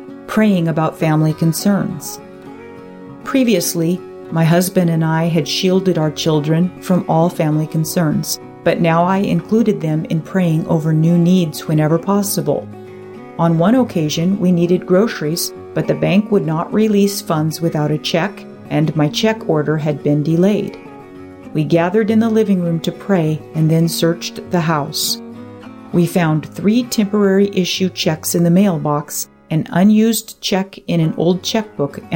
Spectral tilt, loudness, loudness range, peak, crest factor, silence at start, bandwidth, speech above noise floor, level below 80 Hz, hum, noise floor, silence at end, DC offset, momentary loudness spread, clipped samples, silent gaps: -6 dB/octave; -16 LUFS; 2 LU; -2 dBFS; 12 dB; 0 s; 17 kHz; 20 dB; -54 dBFS; none; -35 dBFS; 0 s; under 0.1%; 10 LU; under 0.1%; none